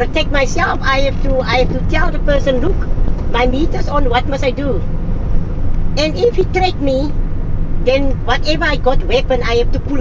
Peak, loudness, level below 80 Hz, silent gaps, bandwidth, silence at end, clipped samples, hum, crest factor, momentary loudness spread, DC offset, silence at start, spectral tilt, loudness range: 0 dBFS; -16 LUFS; -18 dBFS; none; 7.4 kHz; 0 s; under 0.1%; none; 12 dB; 7 LU; 0.4%; 0 s; -6 dB/octave; 2 LU